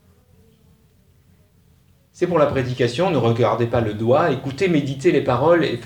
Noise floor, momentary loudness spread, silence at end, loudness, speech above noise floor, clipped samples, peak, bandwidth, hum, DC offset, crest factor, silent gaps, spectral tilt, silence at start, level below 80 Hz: -55 dBFS; 5 LU; 0 s; -19 LUFS; 37 dB; under 0.1%; -4 dBFS; 17 kHz; none; under 0.1%; 16 dB; none; -7 dB/octave; 2.15 s; -50 dBFS